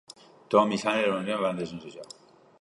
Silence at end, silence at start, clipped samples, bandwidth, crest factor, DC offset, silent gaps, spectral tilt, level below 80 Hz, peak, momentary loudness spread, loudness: 0.55 s; 0.5 s; under 0.1%; 11.5 kHz; 22 dB; under 0.1%; none; -5 dB/octave; -70 dBFS; -8 dBFS; 20 LU; -27 LUFS